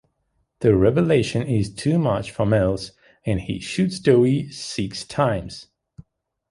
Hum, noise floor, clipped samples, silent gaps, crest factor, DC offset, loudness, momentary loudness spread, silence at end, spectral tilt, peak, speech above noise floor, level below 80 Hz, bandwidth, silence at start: none; -70 dBFS; under 0.1%; none; 18 dB; under 0.1%; -21 LUFS; 12 LU; 0.5 s; -6.5 dB/octave; -4 dBFS; 50 dB; -44 dBFS; 11.5 kHz; 0.6 s